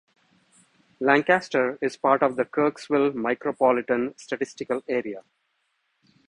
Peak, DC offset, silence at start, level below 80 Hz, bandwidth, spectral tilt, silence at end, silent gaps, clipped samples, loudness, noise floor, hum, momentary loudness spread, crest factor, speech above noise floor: -4 dBFS; under 0.1%; 1 s; -68 dBFS; 10.5 kHz; -5.5 dB/octave; 1.1 s; none; under 0.1%; -24 LUFS; -73 dBFS; none; 9 LU; 20 dB; 49 dB